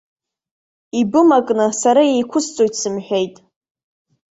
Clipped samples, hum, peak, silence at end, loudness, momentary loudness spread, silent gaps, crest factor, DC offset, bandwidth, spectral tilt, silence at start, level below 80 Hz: under 0.1%; none; -2 dBFS; 1 s; -16 LUFS; 9 LU; none; 16 dB; under 0.1%; 8.2 kHz; -4 dB/octave; 0.95 s; -64 dBFS